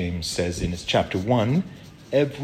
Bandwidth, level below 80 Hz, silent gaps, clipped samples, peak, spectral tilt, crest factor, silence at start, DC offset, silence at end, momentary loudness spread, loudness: 14.5 kHz; -44 dBFS; none; under 0.1%; -8 dBFS; -5.5 dB/octave; 16 dB; 0 s; under 0.1%; 0 s; 7 LU; -24 LUFS